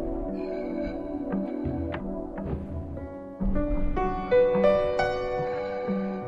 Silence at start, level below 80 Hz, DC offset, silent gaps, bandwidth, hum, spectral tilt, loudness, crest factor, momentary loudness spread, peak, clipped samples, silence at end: 0 s; -38 dBFS; under 0.1%; none; 7.6 kHz; none; -8.5 dB/octave; -28 LUFS; 18 dB; 12 LU; -10 dBFS; under 0.1%; 0 s